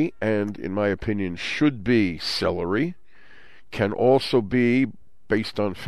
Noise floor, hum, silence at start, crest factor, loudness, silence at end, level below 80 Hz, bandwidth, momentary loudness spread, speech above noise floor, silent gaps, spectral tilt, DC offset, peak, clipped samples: -53 dBFS; none; 0 s; 16 dB; -23 LUFS; 0 s; -50 dBFS; 13.5 kHz; 7 LU; 30 dB; none; -6.5 dB/octave; 0.9%; -8 dBFS; under 0.1%